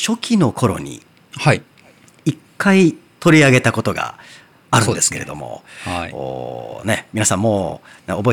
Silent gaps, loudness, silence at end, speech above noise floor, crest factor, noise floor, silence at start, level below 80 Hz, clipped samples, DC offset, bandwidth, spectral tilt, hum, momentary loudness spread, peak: none; -17 LUFS; 0 s; 31 dB; 16 dB; -48 dBFS; 0 s; -50 dBFS; under 0.1%; under 0.1%; 19 kHz; -4.5 dB/octave; none; 16 LU; -2 dBFS